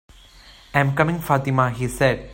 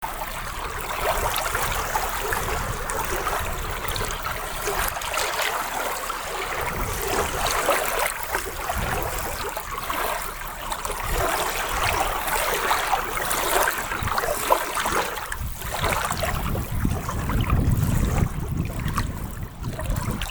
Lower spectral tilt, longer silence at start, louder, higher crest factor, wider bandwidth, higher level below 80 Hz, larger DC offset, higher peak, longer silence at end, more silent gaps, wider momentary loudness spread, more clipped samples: first, -6.5 dB/octave vs -3.5 dB/octave; first, 0.45 s vs 0 s; first, -21 LUFS vs -25 LUFS; about the same, 20 dB vs 22 dB; second, 16.5 kHz vs over 20 kHz; second, -44 dBFS vs -34 dBFS; neither; about the same, -2 dBFS vs -2 dBFS; about the same, 0 s vs 0 s; neither; second, 3 LU vs 7 LU; neither